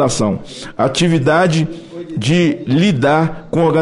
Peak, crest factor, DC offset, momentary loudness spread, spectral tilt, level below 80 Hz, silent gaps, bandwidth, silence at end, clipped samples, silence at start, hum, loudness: -2 dBFS; 14 dB; under 0.1%; 11 LU; -5.5 dB/octave; -42 dBFS; none; 11.5 kHz; 0 s; under 0.1%; 0 s; none; -15 LUFS